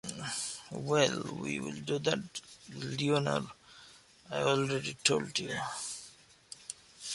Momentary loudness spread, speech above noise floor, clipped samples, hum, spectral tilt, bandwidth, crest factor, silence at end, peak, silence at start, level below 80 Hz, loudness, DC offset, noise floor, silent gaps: 18 LU; 25 dB; under 0.1%; none; -3.5 dB/octave; 11.5 kHz; 26 dB; 0 s; -8 dBFS; 0.05 s; -68 dBFS; -33 LUFS; under 0.1%; -58 dBFS; none